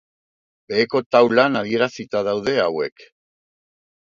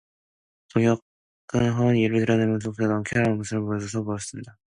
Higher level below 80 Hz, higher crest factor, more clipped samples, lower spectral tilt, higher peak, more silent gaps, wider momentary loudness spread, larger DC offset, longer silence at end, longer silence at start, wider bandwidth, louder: second, -62 dBFS vs -54 dBFS; about the same, 20 dB vs 18 dB; neither; about the same, -5.5 dB/octave vs -6.5 dB/octave; first, 0 dBFS vs -8 dBFS; second, 1.06-1.10 s vs 1.02-1.48 s; about the same, 9 LU vs 9 LU; neither; first, 1.25 s vs 0.25 s; about the same, 0.7 s vs 0.75 s; second, 7.6 kHz vs 11 kHz; first, -19 LUFS vs -24 LUFS